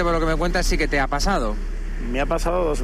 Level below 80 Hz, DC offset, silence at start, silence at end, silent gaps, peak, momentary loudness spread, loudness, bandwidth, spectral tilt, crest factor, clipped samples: -24 dBFS; under 0.1%; 0 s; 0 s; none; -12 dBFS; 9 LU; -23 LUFS; 14 kHz; -4.5 dB/octave; 10 dB; under 0.1%